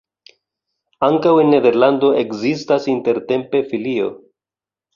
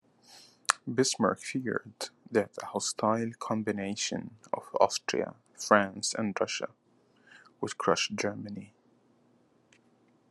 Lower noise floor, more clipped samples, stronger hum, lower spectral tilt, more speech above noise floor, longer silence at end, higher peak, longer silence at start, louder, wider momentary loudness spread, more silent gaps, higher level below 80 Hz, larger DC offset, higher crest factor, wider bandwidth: first, under -90 dBFS vs -66 dBFS; neither; neither; first, -7 dB/octave vs -3.5 dB/octave; first, over 75 dB vs 36 dB; second, 0.8 s vs 1.65 s; about the same, -2 dBFS vs -2 dBFS; first, 1 s vs 0.3 s; first, -16 LUFS vs -31 LUFS; second, 9 LU vs 13 LU; neither; first, -60 dBFS vs -78 dBFS; neither; second, 16 dB vs 30 dB; second, 7.4 kHz vs 12.5 kHz